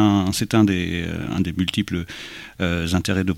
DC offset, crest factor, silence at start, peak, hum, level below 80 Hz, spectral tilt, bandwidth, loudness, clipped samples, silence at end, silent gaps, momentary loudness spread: under 0.1%; 16 dB; 0 s; -4 dBFS; none; -42 dBFS; -5.5 dB/octave; 16.5 kHz; -22 LUFS; under 0.1%; 0 s; none; 11 LU